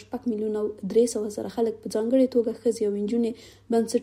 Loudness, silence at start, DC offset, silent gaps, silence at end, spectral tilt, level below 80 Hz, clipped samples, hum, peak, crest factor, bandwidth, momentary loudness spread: -26 LUFS; 0 s; under 0.1%; none; 0 s; -5.5 dB/octave; -62 dBFS; under 0.1%; none; -10 dBFS; 16 dB; 16 kHz; 8 LU